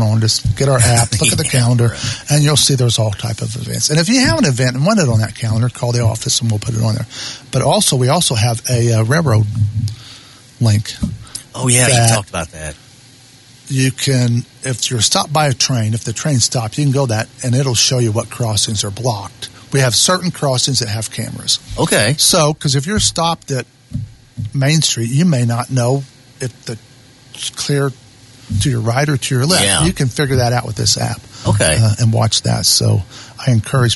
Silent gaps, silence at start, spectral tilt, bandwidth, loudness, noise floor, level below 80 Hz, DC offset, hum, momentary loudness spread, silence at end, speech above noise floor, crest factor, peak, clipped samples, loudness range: none; 0 s; -4 dB/octave; 12 kHz; -14 LUFS; -43 dBFS; -38 dBFS; under 0.1%; none; 12 LU; 0 s; 28 dB; 16 dB; 0 dBFS; under 0.1%; 4 LU